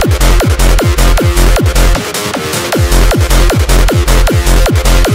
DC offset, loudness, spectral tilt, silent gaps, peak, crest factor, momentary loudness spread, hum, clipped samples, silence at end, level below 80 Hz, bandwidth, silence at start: 2%; -10 LUFS; -4.5 dB/octave; none; 0 dBFS; 8 dB; 3 LU; none; under 0.1%; 0 s; -10 dBFS; 16.5 kHz; 0 s